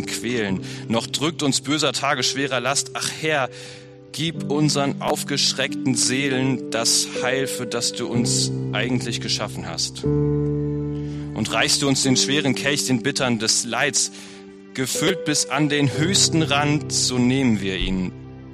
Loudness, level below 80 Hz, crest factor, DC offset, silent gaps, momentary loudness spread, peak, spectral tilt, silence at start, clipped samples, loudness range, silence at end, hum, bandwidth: -21 LUFS; -44 dBFS; 18 dB; under 0.1%; none; 9 LU; -4 dBFS; -3.5 dB/octave; 0 s; under 0.1%; 3 LU; 0 s; none; 13.5 kHz